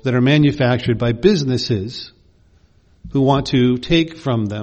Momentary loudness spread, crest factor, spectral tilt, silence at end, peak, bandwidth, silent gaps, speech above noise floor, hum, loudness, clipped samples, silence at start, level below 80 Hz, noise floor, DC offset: 9 LU; 16 dB; -7 dB/octave; 0 s; 0 dBFS; 8.6 kHz; none; 36 dB; none; -17 LUFS; under 0.1%; 0.05 s; -40 dBFS; -53 dBFS; under 0.1%